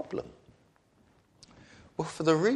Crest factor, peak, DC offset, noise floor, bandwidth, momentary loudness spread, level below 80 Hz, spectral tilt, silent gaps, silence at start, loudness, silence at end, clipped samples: 20 dB; -12 dBFS; under 0.1%; -65 dBFS; 11.5 kHz; 28 LU; -66 dBFS; -6 dB/octave; none; 0 s; -32 LUFS; 0 s; under 0.1%